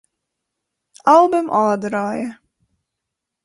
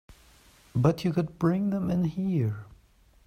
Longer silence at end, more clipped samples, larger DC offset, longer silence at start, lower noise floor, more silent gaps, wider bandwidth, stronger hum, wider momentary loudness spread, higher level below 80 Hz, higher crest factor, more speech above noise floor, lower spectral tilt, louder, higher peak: first, 1.1 s vs 0.55 s; neither; neither; first, 1.05 s vs 0.1 s; first, -81 dBFS vs -60 dBFS; neither; second, 11.5 kHz vs 14.5 kHz; neither; first, 13 LU vs 7 LU; second, -64 dBFS vs -54 dBFS; about the same, 18 dB vs 18 dB; first, 65 dB vs 33 dB; second, -6 dB/octave vs -8.5 dB/octave; first, -17 LUFS vs -28 LUFS; first, -2 dBFS vs -10 dBFS